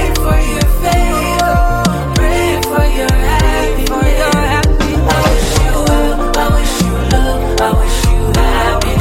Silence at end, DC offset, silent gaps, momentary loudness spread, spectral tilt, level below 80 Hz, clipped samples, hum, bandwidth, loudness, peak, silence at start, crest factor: 0 s; under 0.1%; none; 2 LU; -5 dB/octave; -14 dBFS; under 0.1%; none; 16.5 kHz; -13 LUFS; 0 dBFS; 0 s; 10 dB